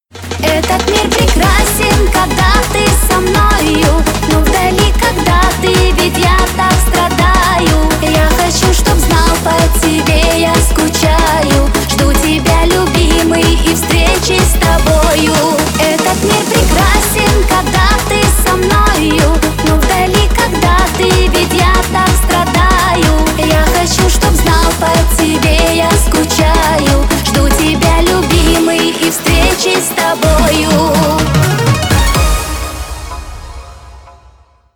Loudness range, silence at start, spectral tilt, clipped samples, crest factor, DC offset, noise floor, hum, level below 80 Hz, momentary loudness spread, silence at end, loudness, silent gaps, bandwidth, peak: 1 LU; 0.15 s; -4 dB/octave; under 0.1%; 10 dB; 0.5%; -43 dBFS; none; -14 dBFS; 2 LU; 0.65 s; -10 LUFS; none; 19.5 kHz; 0 dBFS